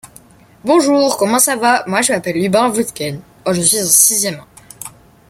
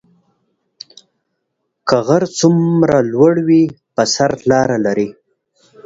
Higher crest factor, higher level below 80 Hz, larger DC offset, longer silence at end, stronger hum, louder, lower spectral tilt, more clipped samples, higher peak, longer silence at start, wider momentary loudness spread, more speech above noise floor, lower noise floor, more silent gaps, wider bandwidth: about the same, 16 dB vs 16 dB; about the same, -54 dBFS vs -52 dBFS; neither; second, 0.4 s vs 0.75 s; neither; about the same, -13 LUFS vs -14 LUFS; second, -2.5 dB/octave vs -5.5 dB/octave; neither; about the same, 0 dBFS vs 0 dBFS; second, 0.05 s vs 1.85 s; first, 20 LU vs 6 LU; second, 30 dB vs 59 dB; second, -44 dBFS vs -72 dBFS; neither; first, 17 kHz vs 7.8 kHz